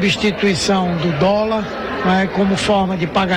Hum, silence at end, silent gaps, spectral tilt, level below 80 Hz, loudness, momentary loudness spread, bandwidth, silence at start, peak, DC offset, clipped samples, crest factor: none; 0 s; none; -5 dB/octave; -40 dBFS; -17 LUFS; 4 LU; 11 kHz; 0 s; -6 dBFS; under 0.1%; under 0.1%; 10 dB